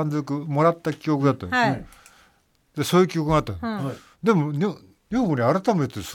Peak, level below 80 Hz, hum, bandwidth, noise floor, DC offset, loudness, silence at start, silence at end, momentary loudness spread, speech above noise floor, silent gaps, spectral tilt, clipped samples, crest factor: -6 dBFS; -50 dBFS; none; 17.5 kHz; -62 dBFS; under 0.1%; -23 LUFS; 0 s; 0 s; 9 LU; 40 dB; none; -6.5 dB/octave; under 0.1%; 18 dB